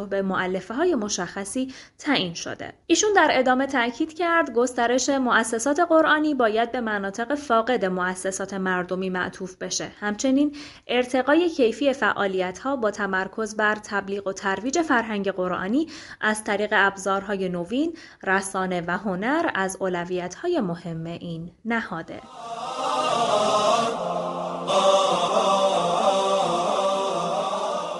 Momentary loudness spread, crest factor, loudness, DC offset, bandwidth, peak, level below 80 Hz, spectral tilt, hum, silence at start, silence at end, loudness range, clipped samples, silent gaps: 9 LU; 20 dB; -23 LUFS; under 0.1%; 11.5 kHz; -4 dBFS; -60 dBFS; -3.5 dB/octave; none; 0 s; 0 s; 5 LU; under 0.1%; none